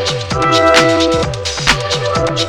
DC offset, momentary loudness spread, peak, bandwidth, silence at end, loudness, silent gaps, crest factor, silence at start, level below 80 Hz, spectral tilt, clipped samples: 0.5%; 7 LU; 0 dBFS; 20 kHz; 0 s; -12 LUFS; none; 14 dB; 0 s; -32 dBFS; -3.5 dB/octave; under 0.1%